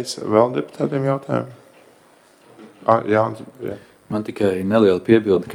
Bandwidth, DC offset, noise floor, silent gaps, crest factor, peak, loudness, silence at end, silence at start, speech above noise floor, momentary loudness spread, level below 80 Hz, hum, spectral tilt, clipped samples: 15 kHz; under 0.1%; -52 dBFS; none; 20 dB; 0 dBFS; -19 LUFS; 0 s; 0 s; 33 dB; 16 LU; -62 dBFS; none; -6.5 dB/octave; under 0.1%